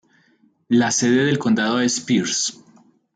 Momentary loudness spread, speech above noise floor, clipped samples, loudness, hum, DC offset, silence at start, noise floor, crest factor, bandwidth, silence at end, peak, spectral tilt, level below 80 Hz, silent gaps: 5 LU; 41 dB; under 0.1%; -19 LUFS; none; under 0.1%; 0.7 s; -59 dBFS; 14 dB; 9.4 kHz; 0.65 s; -6 dBFS; -3.5 dB/octave; -66 dBFS; none